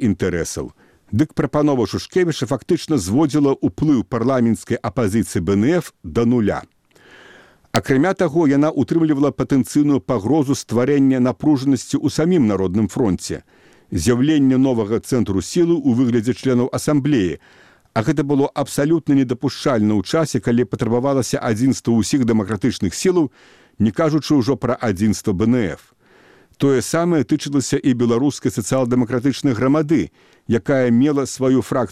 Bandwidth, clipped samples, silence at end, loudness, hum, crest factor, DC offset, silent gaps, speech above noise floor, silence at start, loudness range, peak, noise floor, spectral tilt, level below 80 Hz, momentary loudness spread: 15 kHz; under 0.1%; 0 s; -18 LUFS; none; 18 dB; 0.2%; none; 33 dB; 0 s; 2 LU; 0 dBFS; -50 dBFS; -6.5 dB/octave; -46 dBFS; 5 LU